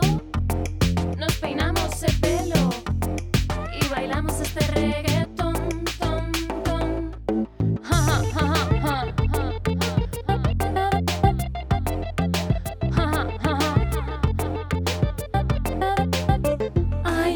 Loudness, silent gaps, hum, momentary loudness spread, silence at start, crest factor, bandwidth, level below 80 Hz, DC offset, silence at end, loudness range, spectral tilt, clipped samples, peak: -24 LUFS; none; none; 5 LU; 0 s; 18 dB; 20 kHz; -30 dBFS; under 0.1%; 0 s; 2 LU; -5.5 dB/octave; under 0.1%; -4 dBFS